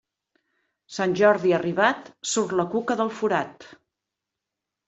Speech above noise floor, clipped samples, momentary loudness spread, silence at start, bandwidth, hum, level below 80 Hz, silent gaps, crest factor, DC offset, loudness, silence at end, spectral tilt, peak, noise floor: 62 dB; under 0.1%; 9 LU; 0.9 s; 8.2 kHz; none; -68 dBFS; none; 20 dB; under 0.1%; -23 LUFS; 1.2 s; -4.5 dB/octave; -4 dBFS; -85 dBFS